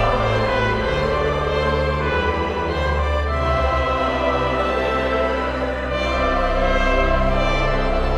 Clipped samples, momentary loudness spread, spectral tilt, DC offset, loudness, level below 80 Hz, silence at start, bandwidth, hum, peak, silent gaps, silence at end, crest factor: under 0.1%; 3 LU; -6.5 dB/octave; under 0.1%; -20 LUFS; -24 dBFS; 0 s; 10 kHz; none; -6 dBFS; none; 0 s; 14 dB